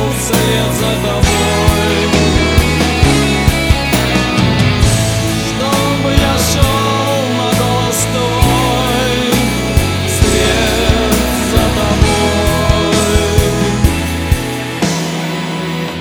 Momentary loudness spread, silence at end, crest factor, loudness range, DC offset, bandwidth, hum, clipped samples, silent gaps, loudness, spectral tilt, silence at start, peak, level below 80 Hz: 4 LU; 0 s; 12 dB; 1 LU; under 0.1%; over 20 kHz; none; 0.1%; none; -12 LUFS; -4.5 dB/octave; 0 s; 0 dBFS; -22 dBFS